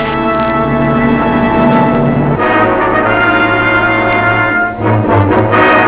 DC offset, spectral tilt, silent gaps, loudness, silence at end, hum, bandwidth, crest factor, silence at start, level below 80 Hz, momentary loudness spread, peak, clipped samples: under 0.1%; -10 dB/octave; none; -10 LUFS; 0 s; none; 4 kHz; 10 dB; 0 s; -30 dBFS; 3 LU; 0 dBFS; 0.3%